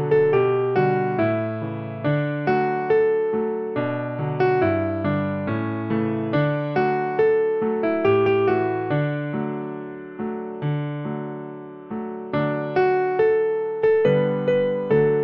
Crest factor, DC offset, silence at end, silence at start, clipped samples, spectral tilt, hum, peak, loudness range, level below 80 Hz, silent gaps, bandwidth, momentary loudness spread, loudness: 14 dB; under 0.1%; 0 s; 0 s; under 0.1%; -10 dB/octave; none; -8 dBFS; 6 LU; -60 dBFS; none; 5.8 kHz; 11 LU; -22 LUFS